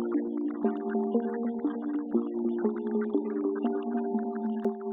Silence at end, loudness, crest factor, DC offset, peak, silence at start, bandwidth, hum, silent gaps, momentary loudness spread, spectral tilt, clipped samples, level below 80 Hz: 0 s; -31 LUFS; 16 dB; under 0.1%; -14 dBFS; 0 s; 3.7 kHz; none; none; 3 LU; -8 dB/octave; under 0.1%; -78 dBFS